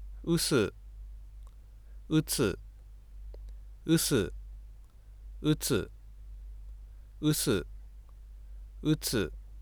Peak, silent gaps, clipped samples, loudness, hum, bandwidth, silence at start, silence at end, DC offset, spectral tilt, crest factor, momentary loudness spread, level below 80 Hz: -14 dBFS; none; under 0.1%; -30 LUFS; none; over 20 kHz; 0 s; 0 s; under 0.1%; -4.5 dB/octave; 18 dB; 25 LU; -46 dBFS